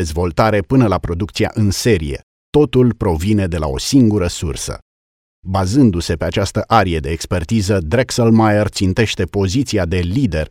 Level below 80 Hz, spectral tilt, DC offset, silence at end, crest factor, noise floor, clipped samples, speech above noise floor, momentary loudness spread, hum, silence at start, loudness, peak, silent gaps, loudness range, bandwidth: -32 dBFS; -6 dB/octave; 0.2%; 0 s; 16 dB; under -90 dBFS; under 0.1%; over 75 dB; 8 LU; none; 0 s; -16 LUFS; 0 dBFS; 2.23-2.52 s, 4.82-5.43 s; 2 LU; 16 kHz